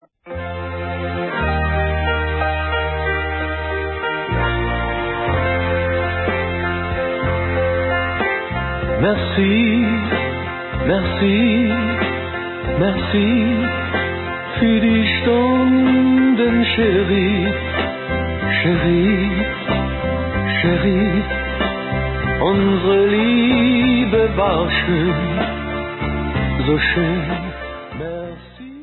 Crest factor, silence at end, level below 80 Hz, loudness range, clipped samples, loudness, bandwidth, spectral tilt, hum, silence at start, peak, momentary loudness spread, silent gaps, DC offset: 14 dB; 0 s; -30 dBFS; 5 LU; under 0.1%; -18 LUFS; 4.3 kHz; -11.5 dB/octave; none; 0.25 s; -2 dBFS; 9 LU; none; under 0.1%